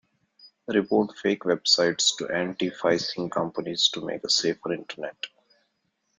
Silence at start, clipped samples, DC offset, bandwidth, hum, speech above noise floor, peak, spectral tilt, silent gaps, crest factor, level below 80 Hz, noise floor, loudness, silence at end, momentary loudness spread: 0.45 s; under 0.1%; under 0.1%; 9.6 kHz; none; 49 dB; -6 dBFS; -2.5 dB/octave; none; 20 dB; -68 dBFS; -75 dBFS; -25 LUFS; 0.9 s; 14 LU